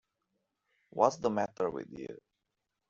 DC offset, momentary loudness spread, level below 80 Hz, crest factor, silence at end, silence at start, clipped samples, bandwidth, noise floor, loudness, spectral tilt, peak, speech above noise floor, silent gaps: under 0.1%; 17 LU; -72 dBFS; 26 dB; 0.75 s; 0.95 s; under 0.1%; 7.6 kHz; -86 dBFS; -32 LUFS; -5 dB/octave; -10 dBFS; 53 dB; none